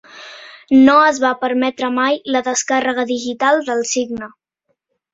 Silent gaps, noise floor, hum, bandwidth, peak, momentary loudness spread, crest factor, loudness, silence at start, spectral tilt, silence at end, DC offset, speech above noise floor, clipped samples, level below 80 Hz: none; -70 dBFS; none; 8 kHz; -2 dBFS; 23 LU; 16 dB; -15 LUFS; 0.15 s; -2 dB/octave; 0.85 s; under 0.1%; 55 dB; under 0.1%; -60 dBFS